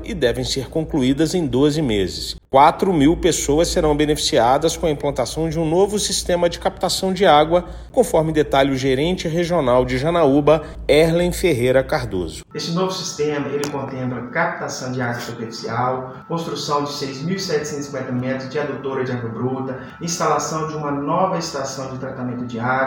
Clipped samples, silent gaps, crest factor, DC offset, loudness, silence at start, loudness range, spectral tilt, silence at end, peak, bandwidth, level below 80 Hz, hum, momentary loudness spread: under 0.1%; none; 18 dB; under 0.1%; -19 LUFS; 0 s; 7 LU; -5 dB/octave; 0 s; 0 dBFS; 17 kHz; -38 dBFS; none; 11 LU